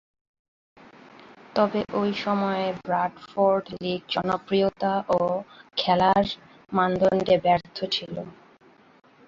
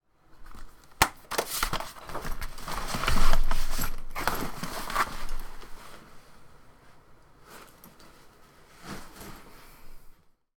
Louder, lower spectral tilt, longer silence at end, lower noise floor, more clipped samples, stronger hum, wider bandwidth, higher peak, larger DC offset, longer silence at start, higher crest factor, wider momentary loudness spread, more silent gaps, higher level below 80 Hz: first, -25 LUFS vs -32 LUFS; first, -6.5 dB/octave vs -3 dB/octave; first, 0.95 s vs 0.5 s; about the same, -55 dBFS vs -54 dBFS; neither; neither; second, 7.4 kHz vs 19 kHz; second, -8 dBFS vs -2 dBFS; neither; first, 1.55 s vs 0.4 s; second, 18 dB vs 26 dB; second, 10 LU vs 25 LU; neither; second, -60 dBFS vs -32 dBFS